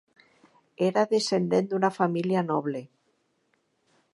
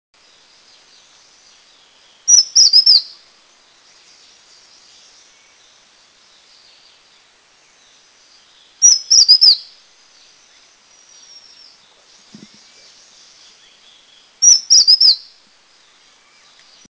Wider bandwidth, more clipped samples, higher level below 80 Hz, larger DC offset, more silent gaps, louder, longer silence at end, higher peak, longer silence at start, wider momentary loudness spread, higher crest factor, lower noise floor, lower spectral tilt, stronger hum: first, 11.5 kHz vs 8 kHz; neither; second, -78 dBFS vs -70 dBFS; neither; neither; second, -26 LUFS vs -8 LUFS; second, 1.25 s vs 1.7 s; second, -8 dBFS vs 0 dBFS; second, 0.8 s vs 2.25 s; second, 5 LU vs 9 LU; about the same, 20 dB vs 18 dB; first, -72 dBFS vs -52 dBFS; first, -6 dB/octave vs 4.5 dB/octave; neither